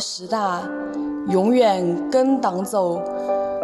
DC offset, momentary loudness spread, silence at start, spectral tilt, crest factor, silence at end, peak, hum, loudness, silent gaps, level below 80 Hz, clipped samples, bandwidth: under 0.1%; 10 LU; 0 s; -5.5 dB/octave; 16 dB; 0 s; -6 dBFS; none; -21 LUFS; none; -62 dBFS; under 0.1%; 13.5 kHz